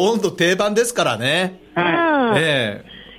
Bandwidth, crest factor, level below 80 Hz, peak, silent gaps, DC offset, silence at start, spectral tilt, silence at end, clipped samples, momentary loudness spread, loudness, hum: 16 kHz; 14 dB; -56 dBFS; -4 dBFS; none; under 0.1%; 0 s; -4 dB/octave; 0.05 s; under 0.1%; 6 LU; -18 LUFS; none